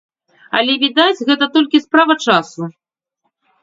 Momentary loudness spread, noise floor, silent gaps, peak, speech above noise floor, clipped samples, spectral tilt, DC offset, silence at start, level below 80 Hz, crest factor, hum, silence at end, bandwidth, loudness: 12 LU; -71 dBFS; none; 0 dBFS; 57 dB; under 0.1%; -4 dB/octave; under 0.1%; 0.55 s; -64 dBFS; 16 dB; none; 0.9 s; 7.8 kHz; -13 LUFS